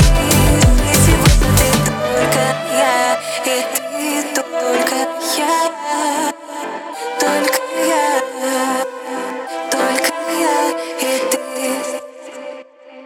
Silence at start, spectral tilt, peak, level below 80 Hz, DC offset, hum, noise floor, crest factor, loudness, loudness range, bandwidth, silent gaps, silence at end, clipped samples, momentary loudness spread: 0 s; -4 dB/octave; 0 dBFS; -24 dBFS; under 0.1%; none; -37 dBFS; 16 dB; -16 LUFS; 5 LU; 19 kHz; none; 0 s; under 0.1%; 13 LU